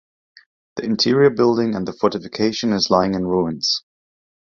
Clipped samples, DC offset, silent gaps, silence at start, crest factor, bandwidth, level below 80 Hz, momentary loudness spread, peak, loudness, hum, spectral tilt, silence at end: under 0.1%; under 0.1%; none; 0.75 s; 18 dB; 7.4 kHz; -52 dBFS; 9 LU; -2 dBFS; -19 LUFS; none; -5 dB/octave; 0.8 s